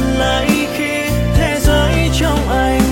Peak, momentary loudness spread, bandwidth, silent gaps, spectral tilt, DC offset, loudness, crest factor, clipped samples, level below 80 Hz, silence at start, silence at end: 0 dBFS; 3 LU; 16.5 kHz; none; -5 dB/octave; under 0.1%; -15 LUFS; 14 dB; under 0.1%; -20 dBFS; 0 s; 0 s